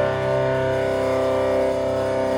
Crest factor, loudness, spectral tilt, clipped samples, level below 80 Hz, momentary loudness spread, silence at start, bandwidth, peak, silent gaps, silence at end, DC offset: 10 dB; -21 LUFS; -6.5 dB/octave; under 0.1%; -46 dBFS; 2 LU; 0 s; 18 kHz; -10 dBFS; none; 0 s; under 0.1%